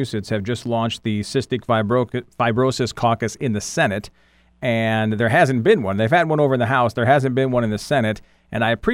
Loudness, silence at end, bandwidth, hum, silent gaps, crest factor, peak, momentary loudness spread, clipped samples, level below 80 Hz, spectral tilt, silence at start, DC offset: -20 LUFS; 0 s; 15.5 kHz; none; none; 18 dB; -2 dBFS; 8 LU; under 0.1%; -48 dBFS; -6 dB/octave; 0 s; under 0.1%